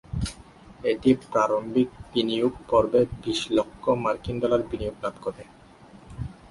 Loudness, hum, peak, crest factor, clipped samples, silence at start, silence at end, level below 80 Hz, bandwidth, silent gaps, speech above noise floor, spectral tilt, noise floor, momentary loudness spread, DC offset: -25 LUFS; none; -8 dBFS; 18 dB; under 0.1%; 0.1 s; 0.2 s; -46 dBFS; 11.5 kHz; none; 25 dB; -6 dB/octave; -50 dBFS; 13 LU; under 0.1%